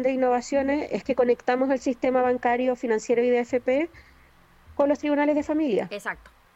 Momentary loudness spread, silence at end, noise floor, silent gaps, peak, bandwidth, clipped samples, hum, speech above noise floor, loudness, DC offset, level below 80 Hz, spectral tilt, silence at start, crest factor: 7 LU; 0.4 s; -55 dBFS; none; -10 dBFS; 9.8 kHz; under 0.1%; none; 32 dB; -24 LUFS; under 0.1%; -56 dBFS; -5 dB/octave; 0 s; 16 dB